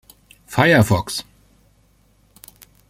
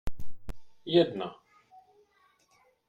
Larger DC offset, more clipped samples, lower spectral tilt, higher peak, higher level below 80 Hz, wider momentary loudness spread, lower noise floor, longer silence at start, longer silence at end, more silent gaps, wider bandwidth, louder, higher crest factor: neither; neither; second, -5.5 dB/octave vs -7 dB/octave; first, -2 dBFS vs -10 dBFS; about the same, -48 dBFS vs -48 dBFS; second, 14 LU vs 24 LU; second, -57 dBFS vs -67 dBFS; first, 0.5 s vs 0.05 s; first, 1.7 s vs 1.55 s; neither; first, 16.5 kHz vs 8.2 kHz; first, -17 LUFS vs -28 LUFS; about the same, 20 dB vs 22 dB